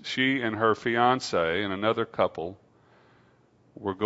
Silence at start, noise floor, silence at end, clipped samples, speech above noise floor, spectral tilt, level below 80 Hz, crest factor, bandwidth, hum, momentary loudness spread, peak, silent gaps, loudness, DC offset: 0.05 s; -61 dBFS; 0 s; under 0.1%; 36 dB; -5 dB/octave; -64 dBFS; 20 dB; 8 kHz; none; 12 LU; -8 dBFS; none; -26 LUFS; under 0.1%